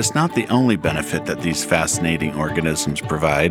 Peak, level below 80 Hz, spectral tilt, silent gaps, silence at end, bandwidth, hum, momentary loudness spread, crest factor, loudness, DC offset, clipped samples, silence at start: -2 dBFS; -40 dBFS; -4.5 dB/octave; none; 0 s; 18 kHz; none; 5 LU; 18 dB; -20 LUFS; under 0.1%; under 0.1%; 0 s